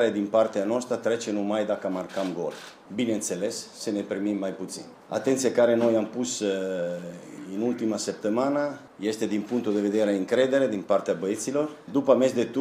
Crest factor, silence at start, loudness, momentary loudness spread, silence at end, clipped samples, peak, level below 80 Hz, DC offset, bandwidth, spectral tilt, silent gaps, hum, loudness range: 18 dB; 0 s; -26 LUFS; 11 LU; 0 s; under 0.1%; -8 dBFS; -74 dBFS; under 0.1%; 15.5 kHz; -4.5 dB/octave; none; none; 4 LU